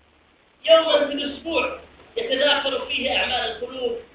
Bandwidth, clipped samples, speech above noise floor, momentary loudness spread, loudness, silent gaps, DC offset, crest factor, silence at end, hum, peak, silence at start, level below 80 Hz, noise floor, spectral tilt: 4 kHz; under 0.1%; 36 dB; 13 LU; -21 LUFS; none; under 0.1%; 20 dB; 0.1 s; none; -4 dBFS; 0.65 s; -54 dBFS; -58 dBFS; -6.5 dB/octave